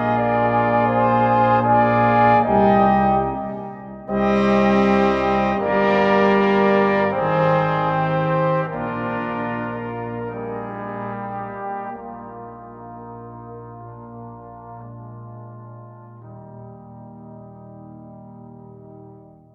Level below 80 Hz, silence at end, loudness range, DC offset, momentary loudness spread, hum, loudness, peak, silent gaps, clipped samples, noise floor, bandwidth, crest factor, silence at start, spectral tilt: -46 dBFS; 0.4 s; 23 LU; under 0.1%; 24 LU; none; -19 LUFS; -4 dBFS; none; under 0.1%; -44 dBFS; 6.8 kHz; 16 dB; 0 s; -8.5 dB/octave